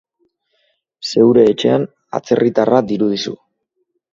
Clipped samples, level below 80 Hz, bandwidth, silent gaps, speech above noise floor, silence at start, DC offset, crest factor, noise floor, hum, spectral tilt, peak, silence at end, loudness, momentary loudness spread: under 0.1%; -58 dBFS; 7.6 kHz; none; 56 dB; 1 s; under 0.1%; 16 dB; -69 dBFS; none; -6 dB/octave; 0 dBFS; 0.8 s; -15 LUFS; 15 LU